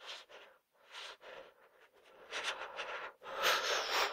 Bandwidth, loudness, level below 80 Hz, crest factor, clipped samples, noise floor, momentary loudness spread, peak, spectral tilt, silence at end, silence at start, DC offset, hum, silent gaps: 16 kHz; -37 LUFS; -78 dBFS; 22 dB; under 0.1%; -66 dBFS; 21 LU; -18 dBFS; 1 dB/octave; 0 s; 0 s; under 0.1%; none; none